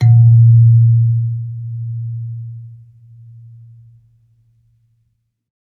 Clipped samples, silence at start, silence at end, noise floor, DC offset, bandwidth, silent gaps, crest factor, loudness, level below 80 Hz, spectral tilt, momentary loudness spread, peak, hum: under 0.1%; 0 s; 2.85 s; -65 dBFS; under 0.1%; 2.1 kHz; none; 12 dB; -12 LUFS; -58 dBFS; -11 dB/octave; 21 LU; -2 dBFS; none